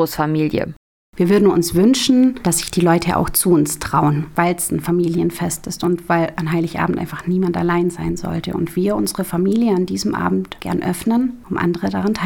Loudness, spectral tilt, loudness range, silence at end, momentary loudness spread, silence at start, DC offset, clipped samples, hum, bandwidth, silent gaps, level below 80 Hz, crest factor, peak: -18 LUFS; -5.5 dB/octave; 4 LU; 0 s; 8 LU; 0 s; under 0.1%; under 0.1%; none; 18.5 kHz; 0.76-1.13 s; -42 dBFS; 16 dB; 0 dBFS